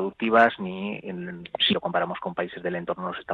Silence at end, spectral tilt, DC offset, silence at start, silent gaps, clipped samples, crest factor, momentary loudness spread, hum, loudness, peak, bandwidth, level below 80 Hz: 0 s; -6.5 dB/octave; under 0.1%; 0 s; none; under 0.1%; 20 dB; 15 LU; none; -25 LUFS; -6 dBFS; 7.2 kHz; -64 dBFS